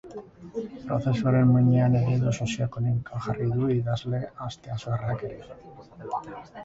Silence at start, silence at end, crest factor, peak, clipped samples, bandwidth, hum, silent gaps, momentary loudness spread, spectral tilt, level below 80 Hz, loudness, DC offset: 0.05 s; 0 s; 16 dB; -10 dBFS; under 0.1%; 7.8 kHz; none; none; 21 LU; -8 dB/octave; -52 dBFS; -26 LUFS; under 0.1%